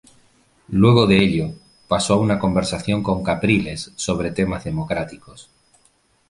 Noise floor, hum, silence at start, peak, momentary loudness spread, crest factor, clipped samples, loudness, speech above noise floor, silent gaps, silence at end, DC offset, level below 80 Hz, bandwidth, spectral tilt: -60 dBFS; none; 0.7 s; -2 dBFS; 12 LU; 18 dB; under 0.1%; -19 LUFS; 41 dB; none; 0.85 s; under 0.1%; -42 dBFS; 11.5 kHz; -6 dB/octave